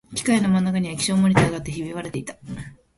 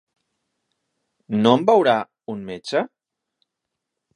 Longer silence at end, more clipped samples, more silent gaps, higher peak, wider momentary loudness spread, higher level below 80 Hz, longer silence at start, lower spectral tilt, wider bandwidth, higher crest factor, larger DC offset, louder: second, 0.25 s vs 1.3 s; neither; neither; about the same, -2 dBFS vs 0 dBFS; about the same, 17 LU vs 17 LU; first, -48 dBFS vs -68 dBFS; second, 0.1 s vs 1.3 s; about the same, -5.5 dB/octave vs -6 dB/octave; about the same, 11.5 kHz vs 11 kHz; about the same, 20 dB vs 22 dB; neither; about the same, -21 LUFS vs -19 LUFS